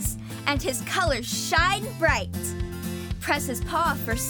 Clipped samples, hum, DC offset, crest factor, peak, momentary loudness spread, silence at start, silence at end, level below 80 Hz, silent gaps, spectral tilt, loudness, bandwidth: under 0.1%; none; under 0.1%; 20 dB; -6 dBFS; 10 LU; 0 s; 0 s; -38 dBFS; none; -3.5 dB/octave; -25 LUFS; over 20 kHz